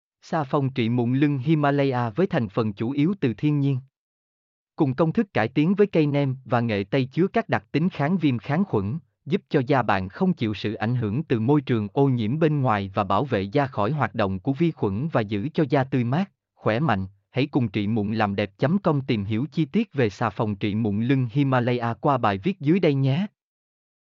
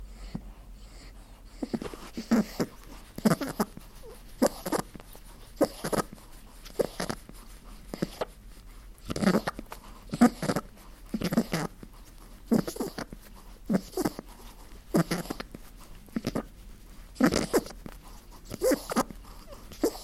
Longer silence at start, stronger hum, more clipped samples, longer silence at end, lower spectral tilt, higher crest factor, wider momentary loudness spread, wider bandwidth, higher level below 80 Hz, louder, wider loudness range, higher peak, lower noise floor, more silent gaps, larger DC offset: first, 0.25 s vs 0 s; neither; neither; first, 0.85 s vs 0 s; about the same, -6.5 dB/octave vs -5.5 dB/octave; second, 16 dB vs 24 dB; second, 5 LU vs 24 LU; second, 7 kHz vs 16.5 kHz; second, -62 dBFS vs -48 dBFS; first, -24 LUFS vs -31 LUFS; second, 2 LU vs 5 LU; about the same, -8 dBFS vs -8 dBFS; first, under -90 dBFS vs -48 dBFS; first, 3.97-4.67 s vs none; neither